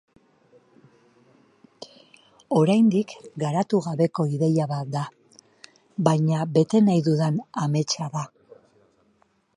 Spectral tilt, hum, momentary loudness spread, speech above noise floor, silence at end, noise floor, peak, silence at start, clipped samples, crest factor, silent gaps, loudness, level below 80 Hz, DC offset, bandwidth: -7 dB/octave; none; 17 LU; 43 dB; 1.3 s; -65 dBFS; -4 dBFS; 1.8 s; under 0.1%; 22 dB; none; -23 LUFS; -70 dBFS; under 0.1%; 11 kHz